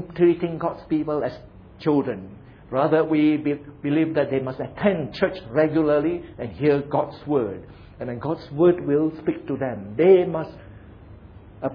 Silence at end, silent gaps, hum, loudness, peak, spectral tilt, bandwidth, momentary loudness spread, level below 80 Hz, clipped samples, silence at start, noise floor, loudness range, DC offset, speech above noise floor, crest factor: 0 s; none; none; -23 LUFS; -4 dBFS; -10 dB/octave; 5.4 kHz; 12 LU; -52 dBFS; under 0.1%; 0 s; -44 dBFS; 2 LU; under 0.1%; 22 dB; 18 dB